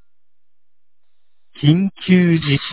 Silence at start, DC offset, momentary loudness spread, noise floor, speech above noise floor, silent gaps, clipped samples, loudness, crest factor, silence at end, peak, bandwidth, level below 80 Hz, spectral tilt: 1.6 s; 0.7%; 4 LU; -84 dBFS; 70 dB; none; under 0.1%; -16 LUFS; 18 dB; 0 s; 0 dBFS; 4 kHz; -50 dBFS; -11 dB/octave